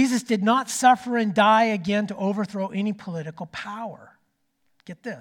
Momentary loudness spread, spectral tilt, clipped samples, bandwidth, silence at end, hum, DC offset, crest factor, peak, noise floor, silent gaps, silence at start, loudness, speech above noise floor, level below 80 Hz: 17 LU; -4.5 dB/octave; under 0.1%; 17.5 kHz; 0 s; none; under 0.1%; 20 dB; -4 dBFS; -70 dBFS; none; 0 s; -22 LUFS; 47 dB; -70 dBFS